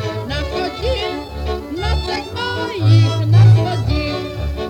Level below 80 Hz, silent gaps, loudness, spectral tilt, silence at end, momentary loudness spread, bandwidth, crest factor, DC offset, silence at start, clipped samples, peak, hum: -28 dBFS; none; -17 LUFS; -7 dB/octave; 0 s; 12 LU; 8.8 kHz; 12 dB; under 0.1%; 0 s; under 0.1%; -4 dBFS; none